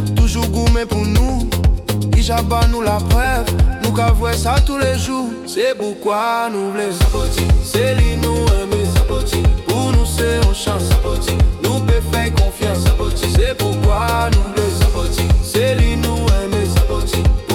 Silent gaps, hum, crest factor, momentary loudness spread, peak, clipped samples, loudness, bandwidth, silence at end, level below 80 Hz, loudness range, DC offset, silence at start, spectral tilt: none; none; 12 dB; 3 LU; -2 dBFS; under 0.1%; -16 LUFS; 17.5 kHz; 0 s; -18 dBFS; 1 LU; under 0.1%; 0 s; -5.5 dB/octave